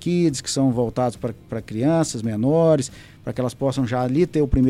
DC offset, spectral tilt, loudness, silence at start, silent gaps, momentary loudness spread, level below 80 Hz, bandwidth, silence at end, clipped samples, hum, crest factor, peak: under 0.1%; -6.5 dB/octave; -22 LUFS; 0 s; none; 13 LU; -38 dBFS; 13.5 kHz; 0 s; under 0.1%; none; 14 dB; -6 dBFS